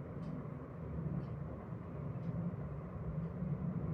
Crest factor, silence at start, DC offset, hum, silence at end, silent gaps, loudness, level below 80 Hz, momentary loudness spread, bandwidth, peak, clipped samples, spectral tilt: 14 dB; 0 s; under 0.1%; none; 0 s; none; -43 LUFS; -56 dBFS; 6 LU; 4.7 kHz; -28 dBFS; under 0.1%; -11 dB/octave